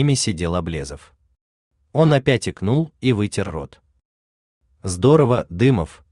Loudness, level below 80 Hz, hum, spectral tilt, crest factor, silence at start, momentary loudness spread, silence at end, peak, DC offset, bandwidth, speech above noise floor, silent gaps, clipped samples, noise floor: -19 LUFS; -46 dBFS; none; -6 dB/octave; 18 dB; 0 s; 16 LU; 0.25 s; -2 dBFS; under 0.1%; 11 kHz; over 71 dB; 1.41-1.71 s, 4.05-4.61 s; under 0.1%; under -90 dBFS